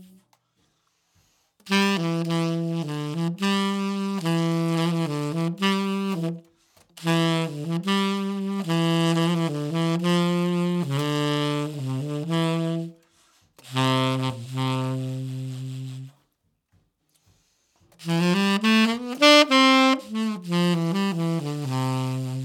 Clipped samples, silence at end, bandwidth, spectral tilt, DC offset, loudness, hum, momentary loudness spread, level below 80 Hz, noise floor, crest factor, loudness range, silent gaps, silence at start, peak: under 0.1%; 0 s; 16 kHz; -5.5 dB/octave; under 0.1%; -23 LUFS; none; 10 LU; -74 dBFS; -72 dBFS; 22 dB; 8 LU; none; 0 s; -2 dBFS